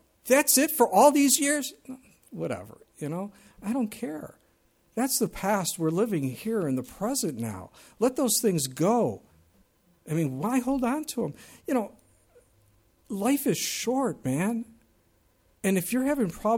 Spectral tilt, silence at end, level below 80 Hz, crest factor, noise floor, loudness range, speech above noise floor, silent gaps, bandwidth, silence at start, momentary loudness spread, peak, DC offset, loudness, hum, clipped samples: -4 dB/octave; 0 s; -60 dBFS; 20 dB; -66 dBFS; 6 LU; 39 dB; none; 18.5 kHz; 0.25 s; 17 LU; -8 dBFS; under 0.1%; -26 LUFS; none; under 0.1%